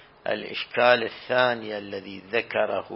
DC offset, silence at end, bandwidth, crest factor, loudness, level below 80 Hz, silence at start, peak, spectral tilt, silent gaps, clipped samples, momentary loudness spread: under 0.1%; 0 s; 5.8 kHz; 22 dB; -25 LUFS; -68 dBFS; 0.25 s; -2 dBFS; -8 dB/octave; none; under 0.1%; 13 LU